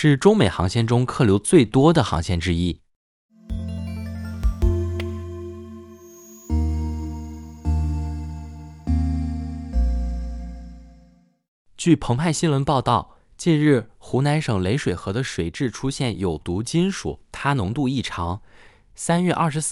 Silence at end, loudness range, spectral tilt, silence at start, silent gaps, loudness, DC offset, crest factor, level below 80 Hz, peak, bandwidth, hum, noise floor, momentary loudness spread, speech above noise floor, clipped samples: 0 s; 8 LU; -6 dB/octave; 0 s; 2.96-3.29 s, 11.48-11.65 s; -22 LUFS; under 0.1%; 20 dB; -32 dBFS; -2 dBFS; 15.5 kHz; none; -55 dBFS; 17 LU; 35 dB; under 0.1%